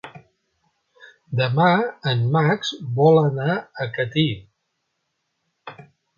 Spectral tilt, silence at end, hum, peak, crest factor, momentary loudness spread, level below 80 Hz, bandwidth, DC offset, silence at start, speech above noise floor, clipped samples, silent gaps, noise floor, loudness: -7 dB/octave; 0.35 s; none; -4 dBFS; 20 dB; 15 LU; -60 dBFS; 7.2 kHz; under 0.1%; 0.05 s; 55 dB; under 0.1%; none; -75 dBFS; -20 LUFS